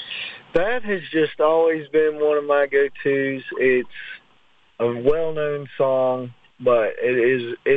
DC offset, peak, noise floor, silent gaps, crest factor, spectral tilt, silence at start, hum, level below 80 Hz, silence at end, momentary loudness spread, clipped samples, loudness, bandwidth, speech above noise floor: under 0.1%; -6 dBFS; -59 dBFS; none; 14 dB; -8 dB/octave; 0 s; none; -52 dBFS; 0 s; 10 LU; under 0.1%; -21 LUFS; 4.8 kHz; 40 dB